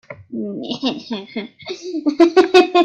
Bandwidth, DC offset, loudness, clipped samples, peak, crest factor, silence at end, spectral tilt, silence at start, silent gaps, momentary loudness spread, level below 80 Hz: 8.4 kHz; under 0.1%; -17 LUFS; under 0.1%; 0 dBFS; 18 dB; 0 s; -4.5 dB/octave; 0.1 s; none; 18 LU; -62 dBFS